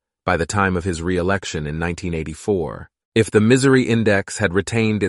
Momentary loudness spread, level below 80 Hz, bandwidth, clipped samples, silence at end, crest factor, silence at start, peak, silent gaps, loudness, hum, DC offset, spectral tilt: 11 LU; -42 dBFS; 11.5 kHz; under 0.1%; 0 s; 18 dB; 0.25 s; -2 dBFS; 3.05-3.12 s; -19 LUFS; none; under 0.1%; -5.5 dB/octave